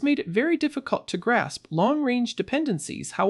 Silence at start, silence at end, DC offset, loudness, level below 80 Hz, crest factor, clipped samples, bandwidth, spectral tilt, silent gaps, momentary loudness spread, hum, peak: 0 s; 0 s; under 0.1%; -25 LUFS; -64 dBFS; 16 dB; under 0.1%; 12 kHz; -5 dB/octave; none; 6 LU; none; -8 dBFS